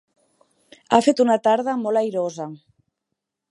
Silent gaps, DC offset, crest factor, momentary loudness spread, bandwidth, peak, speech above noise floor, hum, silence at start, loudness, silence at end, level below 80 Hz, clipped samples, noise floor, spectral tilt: none; under 0.1%; 22 dB; 12 LU; 11.5 kHz; 0 dBFS; 62 dB; none; 0.9 s; -20 LUFS; 0.95 s; -70 dBFS; under 0.1%; -81 dBFS; -5 dB/octave